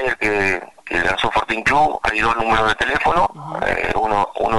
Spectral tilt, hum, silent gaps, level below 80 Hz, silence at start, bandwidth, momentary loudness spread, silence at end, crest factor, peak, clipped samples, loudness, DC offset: -4 dB/octave; none; none; -38 dBFS; 0 s; 12 kHz; 5 LU; 0 s; 12 dB; -6 dBFS; under 0.1%; -18 LUFS; 1%